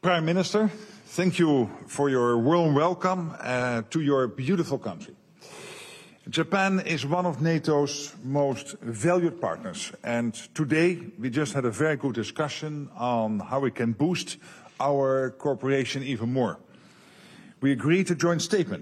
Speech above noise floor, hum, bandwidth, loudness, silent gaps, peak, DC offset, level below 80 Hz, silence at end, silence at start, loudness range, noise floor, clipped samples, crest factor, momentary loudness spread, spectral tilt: 27 dB; none; 13 kHz; -26 LUFS; none; -10 dBFS; under 0.1%; -70 dBFS; 0 s; 0.05 s; 4 LU; -53 dBFS; under 0.1%; 16 dB; 12 LU; -5.5 dB/octave